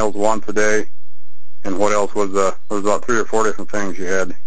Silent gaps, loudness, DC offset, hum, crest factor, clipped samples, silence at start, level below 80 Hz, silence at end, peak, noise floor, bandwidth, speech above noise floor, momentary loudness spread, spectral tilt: none; -20 LUFS; 20%; none; 18 dB; under 0.1%; 0 s; -50 dBFS; 0 s; 0 dBFS; -60 dBFS; 8 kHz; 41 dB; 7 LU; -4 dB/octave